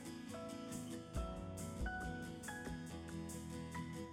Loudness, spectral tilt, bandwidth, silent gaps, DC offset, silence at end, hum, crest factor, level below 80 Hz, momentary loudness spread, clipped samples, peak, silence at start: -47 LUFS; -5 dB/octave; 16 kHz; none; under 0.1%; 0 s; none; 16 dB; -54 dBFS; 4 LU; under 0.1%; -32 dBFS; 0 s